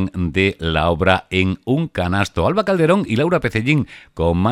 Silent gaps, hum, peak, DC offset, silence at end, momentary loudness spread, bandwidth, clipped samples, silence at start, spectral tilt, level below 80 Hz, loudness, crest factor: none; none; 0 dBFS; under 0.1%; 0 s; 5 LU; 13.5 kHz; under 0.1%; 0 s; -6.5 dB/octave; -36 dBFS; -18 LUFS; 18 dB